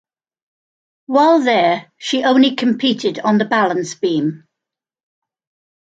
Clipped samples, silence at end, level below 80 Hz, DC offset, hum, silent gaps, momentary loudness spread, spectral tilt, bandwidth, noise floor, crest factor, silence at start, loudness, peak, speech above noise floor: under 0.1%; 1.45 s; -68 dBFS; under 0.1%; none; none; 8 LU; -5 dB/octave; 9 kHz; -85 dBFS; 16 dB; 1.1 s; -16 LUFS; -2 dBFS; 69 dB